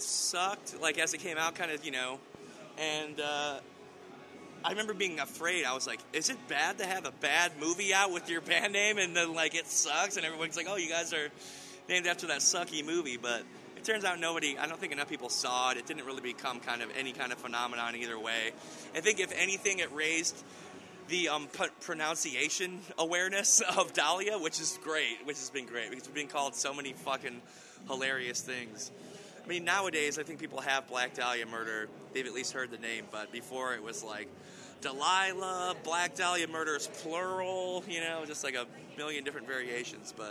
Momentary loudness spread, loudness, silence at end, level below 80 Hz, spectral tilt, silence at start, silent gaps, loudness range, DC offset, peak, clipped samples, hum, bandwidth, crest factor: 13 LU; -33 LUFS; 0 s; -84 dBFS; -1 dB/octave; 0 s; none; 7 LU; under 0.1%; -10 dBFS; under 0.1%; none; 19.5 kHz; 24 dB